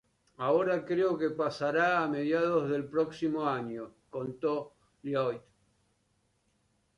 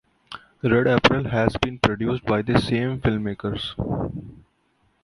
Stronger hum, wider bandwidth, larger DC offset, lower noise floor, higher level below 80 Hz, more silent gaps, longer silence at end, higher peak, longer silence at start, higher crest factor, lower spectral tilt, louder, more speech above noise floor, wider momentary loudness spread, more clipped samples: neither; about the same, 11 kHz vs 11.5 kHz; neither; first, -74 dBFS vs -66 dBFS; second, -72 dBFS vs -42 dBFS; neither; first, 1.6 s vs 0.7 s; second, -16 dBFS vs 0 dBFS; about the same, 0.4 s vs 0.3 s; second, 16 dB vs 22 dB; about the same, -7 dB/octave vs -6.5 dB/octave; second, -31 LUFS vs -22 LUFS; about the same, 44 dB vs 44 dB; about the same, 13 LU vs 13 LU; neither